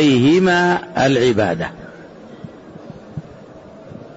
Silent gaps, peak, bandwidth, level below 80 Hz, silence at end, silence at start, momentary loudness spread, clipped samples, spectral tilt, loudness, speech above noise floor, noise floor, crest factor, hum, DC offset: none; -4 dBFS; 8 kHz; -50 dBFS; 0.05 s; 0 s; 25 LU; under 0.1%; -6 dB/octave; -15 LUFS; 24 dB; -39 dBFS; 14 dB; none; under 0.1%